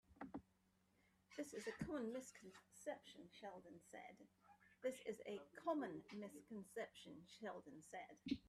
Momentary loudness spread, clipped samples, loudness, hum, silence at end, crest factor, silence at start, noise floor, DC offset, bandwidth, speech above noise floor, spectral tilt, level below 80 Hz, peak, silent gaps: 13 LU; under 0.1%; -53 LUFS; none; 0 s; 20 dB; 0.1 s; -81 dBFS; under 0.1%; 14 kHz; 29 dB; -5 dB/octave; -80 dBFS; -32 dBFS; none